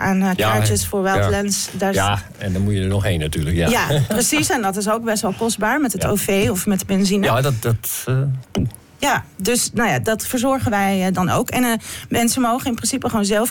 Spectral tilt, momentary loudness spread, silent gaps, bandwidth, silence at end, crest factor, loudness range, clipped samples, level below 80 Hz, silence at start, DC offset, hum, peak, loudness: -4.5 dB/octave; 4 LU; none; 18 kHz; 0 s; 10 dB; 1 LU; under 0.1%; -40 dBFS; 0 s; under 0.1%; none; -8 dBFS; -19 LUFS